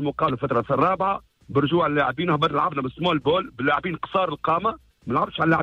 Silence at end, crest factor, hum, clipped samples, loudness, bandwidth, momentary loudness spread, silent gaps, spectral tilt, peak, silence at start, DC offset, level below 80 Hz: 0 s; 16 dB; none; under 0.1%; -23 LUFS; 8 kHz; 5 LU; none; -8 dB/octave; -8 dBFS; 0 s; under 0.1%; -52 dBFS